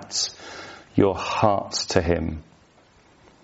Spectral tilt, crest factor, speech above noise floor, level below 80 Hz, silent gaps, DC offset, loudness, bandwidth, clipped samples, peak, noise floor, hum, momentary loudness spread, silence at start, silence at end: -4 dB/octave; 22 dB; 34 dB; -44 dBFS; none; under 0.1%; -23 LUFS; 8 kHz; under 0.1%; -4 dBFS; -56 dBFS; none; 17 LU; 0 s; 1 s